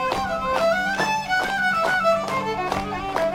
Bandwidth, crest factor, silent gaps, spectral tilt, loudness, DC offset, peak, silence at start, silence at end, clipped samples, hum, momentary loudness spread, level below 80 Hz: 16.5 kHz; 16 dB; none; -4 dB/octave; -22 LUFS; under 0.1%; -6 dBFS; 0 s; 0 s; under 0.1%; none; 6 LU; -46 dBFS